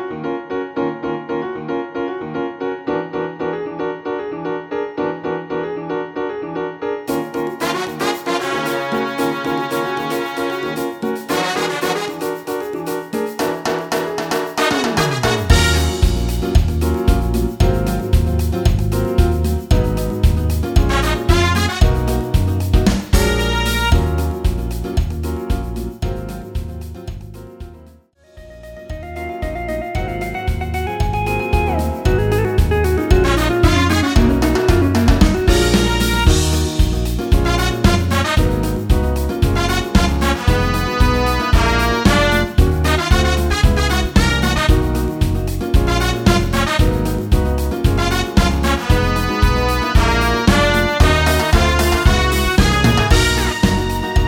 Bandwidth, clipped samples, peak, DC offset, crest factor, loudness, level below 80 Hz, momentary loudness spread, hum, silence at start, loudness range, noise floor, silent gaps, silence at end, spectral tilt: 18 kHz; under 0.1%; 0 dBFS; under 0.1%; 16 dB; -17 LUFS; -20 dBFS; 10 LU; none; 0 s; 9 LU; -47 dBFS; none; 0 s; -5.5 dB/octave